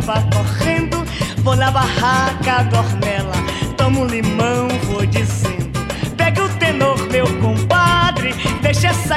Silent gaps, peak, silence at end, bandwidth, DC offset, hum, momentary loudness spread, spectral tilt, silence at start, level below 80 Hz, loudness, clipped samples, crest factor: none; -2 dBFS; 0 s; 14.5 kHz; under 0.1%; none; 6 LU; -5.5 dB/octave; 0 s; -32 dBFS; -16 LUFS; under 0.1%; 14 dB